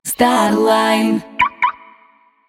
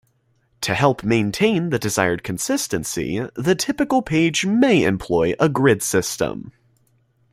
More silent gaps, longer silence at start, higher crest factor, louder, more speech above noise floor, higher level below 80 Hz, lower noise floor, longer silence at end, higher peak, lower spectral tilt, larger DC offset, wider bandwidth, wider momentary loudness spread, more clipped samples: neither; second, 0.05 s vs 0.6 s; about the same, 16 dB vs 18 dB; first, -15 LUFS vs -20 LUFS; second, 38 dB vs 44 dB; about the same, -52 dBFS vs -50 dBFS; second, -52 dBFS vs -63 dBFS; about the same, 0.75 s vs 0.8 s; about the same, -2 dBFS vs -2 dBFS; about the same, -4 dB/octave vs -4.5 dB/octave; neither; first, 18.5 kHz vs 16 kHz; about the same, 6 LU vs 8 LU; neither